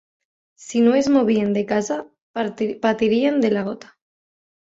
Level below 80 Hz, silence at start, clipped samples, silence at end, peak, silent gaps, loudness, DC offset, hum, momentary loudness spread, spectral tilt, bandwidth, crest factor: -62 dBFS; 0.6 s; under 0.1%; 0.9 s; -4 dBFS; 2.22-2.34 s; -20 LUFS; under 0.1%; none; 11 LU; -5.5 dB/octave; 7.8 kHz; 16 dB